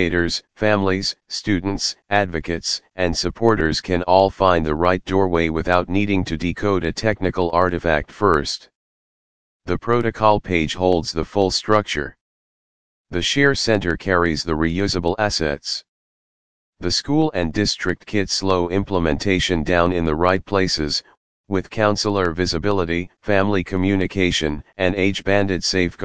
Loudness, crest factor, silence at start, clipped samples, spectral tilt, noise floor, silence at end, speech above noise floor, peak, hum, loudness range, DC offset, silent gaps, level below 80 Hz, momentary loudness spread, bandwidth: -20 LUFS; 20 dB; 0 s; under 0.1%; -5 dB/octave; under -90 dBFS; 0 s; over 71 dB; 0 dBFS; none; 3 LU; 2%; 8.75-9.60 s, 12.21-13.05 s, 15.88-16.73 s, 21.17-21.44 s; -38 dBFS; 7 LU; 10 kHz